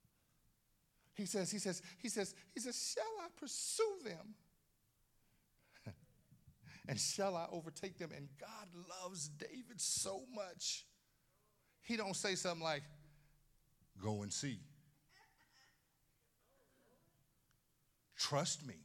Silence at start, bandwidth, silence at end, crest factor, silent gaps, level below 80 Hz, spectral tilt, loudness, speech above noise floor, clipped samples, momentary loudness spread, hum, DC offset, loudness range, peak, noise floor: 1.15 s; 17.5 kHz; 0 s; 22 dB; none; -80 dBFS; -3 dB/octave; -43 LUFS; 35 dB; under 0.1%; 16 LU; none; under 0.1%; 7 LU; -24 dBFS; -79 dBFS